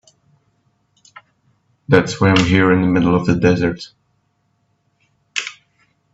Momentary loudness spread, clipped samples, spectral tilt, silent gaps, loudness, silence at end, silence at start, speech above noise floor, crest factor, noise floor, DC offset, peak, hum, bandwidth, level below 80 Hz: 18 LU; under 0.1%; -6 dB/octave; none; -15 LUFS; 0.6 s; 1.9 s; 51 dB; 18 dB; -65 dBFS; under 0.1%; 0 dBFS; none; 8 kHz; -48 dBFS